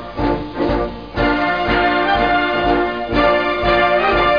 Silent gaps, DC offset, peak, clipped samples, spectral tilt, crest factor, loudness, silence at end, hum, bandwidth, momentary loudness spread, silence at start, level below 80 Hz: none; 0.5%; -2 dBFS; under 0.1%; -7 dB/octave; 14 dB; -16 LUFS; 0 s; none; 5.2 kHz; 6 LU; 0 s; -30 dBFS